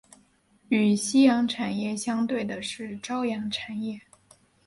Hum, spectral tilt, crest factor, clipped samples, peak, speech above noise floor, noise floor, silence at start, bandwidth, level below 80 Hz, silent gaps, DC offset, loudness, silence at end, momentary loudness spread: none; -4.5 dB/octave; 18 dB; under 0.1%; -8 dBFS; 37 dB; -63 dBFS; 0.7 s; 11.5 kHz; -66 dBFS; none; under 0.1%; -26 LUFS; 0.65 s; 14 LU